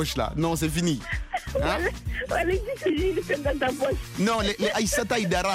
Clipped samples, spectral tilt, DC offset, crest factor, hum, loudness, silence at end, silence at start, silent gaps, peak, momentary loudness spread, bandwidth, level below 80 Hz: under 0.1%; -4.5 dB/octave; under 0.1%; 16 dB; none; -26 LUFS; 0 s; 0 s; none; -10 dBFS; 5 LU; 16 kHz; -38 dBFS